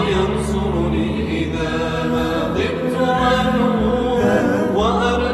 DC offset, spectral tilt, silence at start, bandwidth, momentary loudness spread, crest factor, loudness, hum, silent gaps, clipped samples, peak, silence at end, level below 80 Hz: under 0.1%; -6.5 dB/octave; 0 s; 13 kHz; 5 LU; 12 dB; -18 LUFS; none; none; under 0.1%; -4 dBFS; 0 s; -32 dBFS